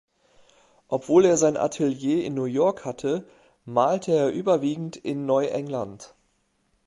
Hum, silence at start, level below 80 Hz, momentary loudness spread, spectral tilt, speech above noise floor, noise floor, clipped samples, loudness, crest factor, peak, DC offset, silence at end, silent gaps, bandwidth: none; 0.9 s; -66 dBFS; 12 LU; -5.5 dB/octave; 46 dB; -69 dBFS; under 0.1%; -24 LUFS; 18 dB; -6 dBFS; under 0.1%; 0.8 s; none; 11.5 kHz